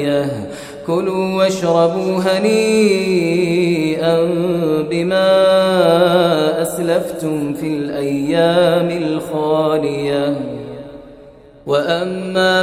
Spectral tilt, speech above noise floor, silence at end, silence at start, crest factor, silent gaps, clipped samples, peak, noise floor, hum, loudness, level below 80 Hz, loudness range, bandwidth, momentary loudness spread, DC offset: -5.5 dB/octave; 26 dB; 0 s; 0 s; 14 dB; none; under 0.1%; 0 dBFS; -41 dBFS; none; -16 LUFS; -52 dBFS; 5 LU; 16 kHz; 9 LU; under 0.1%